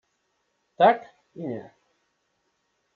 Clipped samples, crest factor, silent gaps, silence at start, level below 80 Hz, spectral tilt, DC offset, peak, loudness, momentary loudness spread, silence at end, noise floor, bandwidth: under 0.1%; 22 dB; none; 0.8 s; -82 dBFS; -3.5 dB/octave; under 0.1%; -6 dBFS; -23 LUFS; 17 LU; 1.35 s; -74 dBFS; 4.9 kHz